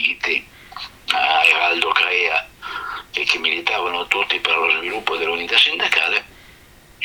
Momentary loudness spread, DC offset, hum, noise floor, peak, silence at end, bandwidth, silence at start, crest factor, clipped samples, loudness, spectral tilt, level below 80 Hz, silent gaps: 15 LU; under 0.1%; none; -47 dBFS; 0 dBFS; 0 s; over 20 kHz; 0 s; 20 dB; under 0.1%; -17 LUFS; -1 dB/octave; -54 dBFS; none